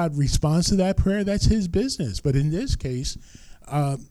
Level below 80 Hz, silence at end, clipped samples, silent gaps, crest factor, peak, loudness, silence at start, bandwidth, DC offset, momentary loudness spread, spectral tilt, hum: -32 dBFS; 0.05 s; under 0.1%; none; 14 dB; -8 dBFS; -23 LUFS; 0 s; 13.5 kHz; under 0.1%; 8 LU; -6 dB/octave; none